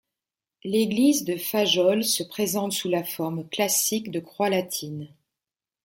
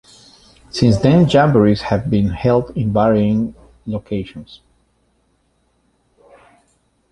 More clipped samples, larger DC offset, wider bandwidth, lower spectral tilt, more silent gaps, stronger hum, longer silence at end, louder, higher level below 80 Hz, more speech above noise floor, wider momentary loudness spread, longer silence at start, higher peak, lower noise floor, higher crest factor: neither; neither; first, 17 kHz vs 11 kHz; second, -3.5 dB/octave vs -7.5 dB/octave; neither; neither; second, 0.75 s vs 2.55 s; second, -24 LUFS vs -16 LUFS; second, -70 dBFS vs -40 dBFS; first, over 65 dB vs 47 dB; second, 11 LU vs 16 LU; about the same, 0.65 s vs 0.75 s; second, -8 dBFS vs -2 dBFS; first, under -90 dBFS vs -62 dBFS; about the same, 18 dB vs 16 dB